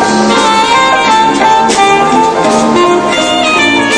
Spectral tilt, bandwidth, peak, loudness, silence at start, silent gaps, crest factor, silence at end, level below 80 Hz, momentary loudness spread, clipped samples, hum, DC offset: -3 dB/octave; 10.5 kHz; 0 dBFS; -7 LUFS; 0 s; none; 8 dB; 0 s; -40 dBFS; 2 LU; 0.4%; none; under 0.1%